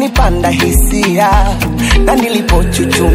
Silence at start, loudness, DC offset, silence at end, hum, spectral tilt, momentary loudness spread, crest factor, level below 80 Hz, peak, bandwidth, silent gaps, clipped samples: 0 s; -11 LUFS; under 0.1%; 0 s; none; -5 dB/octave; 2 LU; 10 dB; -14 dBFS; 0 dBFS; 16.5 kHz; none; under 0.1%